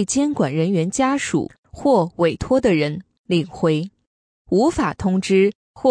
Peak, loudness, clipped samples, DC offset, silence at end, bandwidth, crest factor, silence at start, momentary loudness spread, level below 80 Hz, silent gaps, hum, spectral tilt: -4 dBFS; -20 LUFS; under 0.1%; under 0.1%; 0 s; 10.5 kHz; 16 dB; 0 s; 7 LU; -46 dBFS; 1.58-1.63 s, 3.18-3.24 s, 4.07-4.45 s, 5.55-5.74 s; none; -5.5 dB/octave